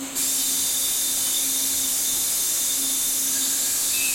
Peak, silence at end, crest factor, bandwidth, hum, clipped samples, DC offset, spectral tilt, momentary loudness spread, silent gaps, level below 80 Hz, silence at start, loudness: -10 dBFS; 0 s; 12 dB; 16.5 kHz; none; under 0.1%; under 0.1%; 1.5 dB/octave; 0 LU; none; -58 dBFS; 0 s; -20 LUFS